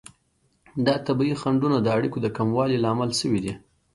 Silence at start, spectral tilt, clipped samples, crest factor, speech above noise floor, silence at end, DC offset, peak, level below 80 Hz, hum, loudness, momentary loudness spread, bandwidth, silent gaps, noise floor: 0.75 s; -6 dB/octave; under 0.1%; 18 dB; 45 dB; 0.35 s; under 0.1%; -6 dBFS; -56 dBFS; none; -24 LUFS; 5 LU; 11.5 kHz; none; -67 dBFS